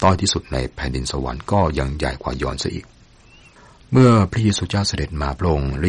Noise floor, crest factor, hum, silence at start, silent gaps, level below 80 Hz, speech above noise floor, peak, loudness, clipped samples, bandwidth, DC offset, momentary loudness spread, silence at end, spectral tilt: -48 dBFS; 16 dB; none; 0 s; none; -32 dBFS; 29 dB; -4 dBFS; -20 LUFS; under 0.1%; 11 kHz; under 0.1%; 12 LU; 0 s; -5.5 dB/octave